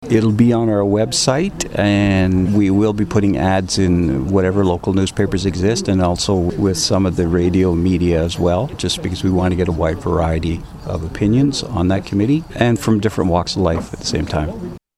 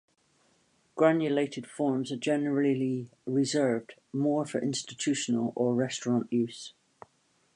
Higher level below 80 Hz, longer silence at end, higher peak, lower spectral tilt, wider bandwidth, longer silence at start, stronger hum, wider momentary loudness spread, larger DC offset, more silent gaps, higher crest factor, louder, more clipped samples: first, -34 dBFS vs -78 dBFS; second, 0.2 s vs 0.85 s; first, -2 dBFS vs -8 dBFS; about the same, -6 dB/octave vs -5 dB/octave; first, 13 kHz vs 11 kHz; second, 0 s vs 0.95 s; neither; about the same, 6 LU vs 8 LU; neither; neither; second, 14 dB vs 22 dB; first, -17 LUFS vs -29 LUFS; neither